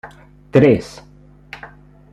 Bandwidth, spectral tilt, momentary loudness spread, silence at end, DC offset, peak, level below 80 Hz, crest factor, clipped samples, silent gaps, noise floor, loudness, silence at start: 11.5 kHz; -8 dB/octave; 24 LU; 1.25 s; under 0.1%; -2 dBFS; -48 dBFS; 18 dB; under 0.1%; none; -41 dBFS; -15 LUFS; 0.05 s